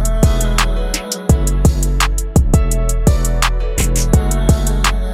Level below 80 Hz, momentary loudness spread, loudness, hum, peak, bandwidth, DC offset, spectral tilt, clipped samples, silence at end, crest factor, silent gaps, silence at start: -16 dBFS; 4 LU; -16 LUFS; none; 0 dBFS; 16 kHz; under 0.1%; -5 dB/octave; under 0.1%; 0 s; 12 dB; none; 0 s